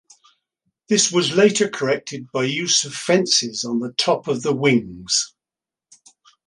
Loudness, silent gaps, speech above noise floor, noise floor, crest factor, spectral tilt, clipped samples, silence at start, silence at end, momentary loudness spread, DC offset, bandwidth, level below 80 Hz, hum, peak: -19 LUFS; none; 70 dB; -89 dBFS; 20 dB; -3 dB/octave; under 0.1%; 0.9 s; 1.2 s; 8 LU; under 0.1%; 11.5 kHz; -62 dBFS; none; -2 dBFS